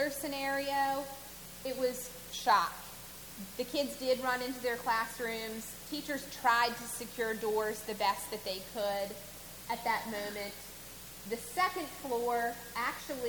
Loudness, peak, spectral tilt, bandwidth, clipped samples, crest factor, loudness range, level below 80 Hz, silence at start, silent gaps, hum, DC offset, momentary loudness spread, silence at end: -35 LUFS; -16 dBFS; -2.5 dB/octave; 19.5 kHz; under 0.1%; 20 dB; 3 LU; -62 dBFS; 0 s; none; 60 Hz at -60 dBFS; under 0.1%; 15 LU; 0 s